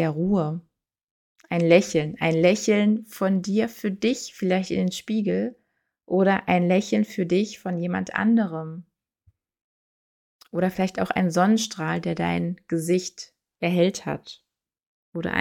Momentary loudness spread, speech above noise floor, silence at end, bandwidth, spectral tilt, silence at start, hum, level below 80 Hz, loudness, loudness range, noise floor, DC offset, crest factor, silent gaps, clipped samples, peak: 12 LU; 42 dB; 0 s; 17 kHz; -6 dB/octave; 0 s; none; -62 dBFS; -24 LUFS; 5 LU; -65 dBFS; under 0.1%; 20 dB; 1.03-1.35 s, 9.64-10.39 s, 14.86-15.12 s; under 0.1%; -4 dBFS